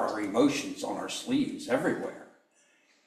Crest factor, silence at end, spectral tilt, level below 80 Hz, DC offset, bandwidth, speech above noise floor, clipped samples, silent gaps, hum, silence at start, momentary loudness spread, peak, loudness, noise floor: 18 dB; 0.8 s; -4.5 dB/octave; -72 dBFS; under 0.1%; 14 kHz; 37 dB; under 0.1%; none; none; 0 s; 9 LU; -12 dBFS; -30 LUFS; -66 dBFS